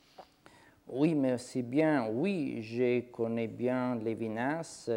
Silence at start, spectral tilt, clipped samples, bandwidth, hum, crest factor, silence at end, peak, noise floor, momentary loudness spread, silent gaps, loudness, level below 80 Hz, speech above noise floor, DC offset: 0.2 s; -7 dB/octave; under 0.1%; 11.5 kHz; none; 16 dB; 0 s; -16 dBFS; -60 dBFS; 7 LU; none; -32 LUFS; -74 dBFS; 29 dB; under 0.1%